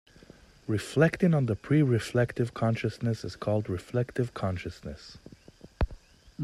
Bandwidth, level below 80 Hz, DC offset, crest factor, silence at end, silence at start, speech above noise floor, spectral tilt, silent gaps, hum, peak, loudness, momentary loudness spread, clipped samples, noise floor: 12.5 kHz; -46 dBFS; under 0.1%; 20 dB; 0 s; 0.7 s; 26 dB; -7.5 dB/octave; none; none; -8 dBFS; -29 LUFS; 15 LU; under 0.1%; -54 dBFS